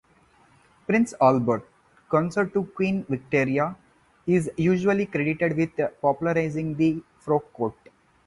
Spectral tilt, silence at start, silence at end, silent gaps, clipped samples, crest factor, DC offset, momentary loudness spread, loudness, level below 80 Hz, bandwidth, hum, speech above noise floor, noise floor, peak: -7.5 dB/octave; 0.9 s; 0.55 s; none; under 0.1%; 20 dB; under 0.1%; 9 LU; -25 LUFS; -58 dBFS; 11.5 kHz; none; 35 dB; -59 dBFS; -6 dBFS